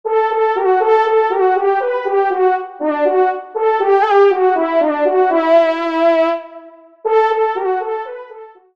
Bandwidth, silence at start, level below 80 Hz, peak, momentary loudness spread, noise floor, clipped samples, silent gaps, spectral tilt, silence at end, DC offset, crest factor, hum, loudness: 6.4 kHz; 0.05 s; -68 dBFS; -2 dBFS; 8 LU; -39 dBFS; under 0.1%; none; -4 dB/octave; 0.25 s; 0.2%; 14 dB; none; -15 LUFS